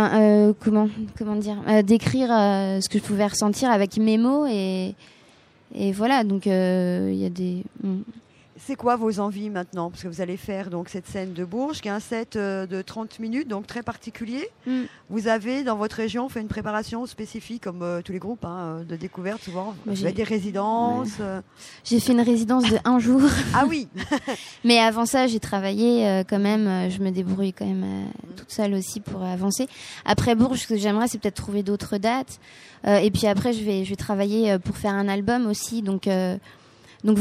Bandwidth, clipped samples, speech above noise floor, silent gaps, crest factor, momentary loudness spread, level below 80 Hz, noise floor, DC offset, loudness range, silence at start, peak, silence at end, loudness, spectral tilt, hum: 15 kHz; under 0.1%; 31 dB; none; 20 dB; 13 LU; -52 dBFS; -55 dBFS; under 0.1%; 9 LU; 0 s; -2 dBFS; 0 s; -24 LUFS; -5.5 dB/octave; none